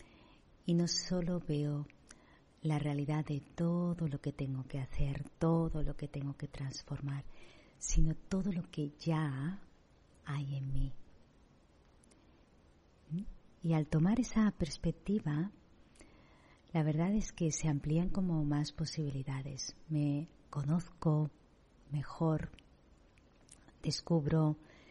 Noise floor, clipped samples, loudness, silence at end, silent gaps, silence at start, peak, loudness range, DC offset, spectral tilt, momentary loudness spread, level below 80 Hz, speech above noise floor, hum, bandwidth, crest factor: -65 dBFS; under 0.1%; -37 LUFS; 0.25 s; none; 0 s; -18 dBFS; 6 LU; under 0.1%; -6.5 dB/octave; 10 LU; -46 dBFS; 30 dB; none; 11 kHz; 20 dB